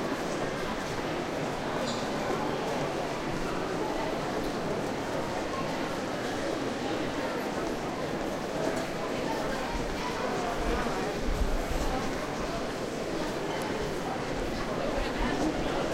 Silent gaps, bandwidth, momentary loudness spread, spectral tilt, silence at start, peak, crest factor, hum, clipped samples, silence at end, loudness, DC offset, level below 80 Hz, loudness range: none; 16 kHz; 2 LU; -5 dB/octave; 0 s; -14 dBFS; 16 dB; none; under 0.1%; 0 s; -32 LUFS; under 0.1%; -40 dBFS; 1 LU